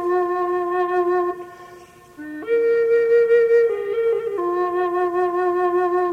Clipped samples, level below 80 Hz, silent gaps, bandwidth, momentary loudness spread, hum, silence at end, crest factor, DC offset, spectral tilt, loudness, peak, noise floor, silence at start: under 0.1%; -64 dBFS; none; 6.4 kHz; 10 LU; none; 0 s; 12 dB; under 0.1%; -6 dB/octave; -19 LUFS; -8 dBFS; -44 dBFS; 0 s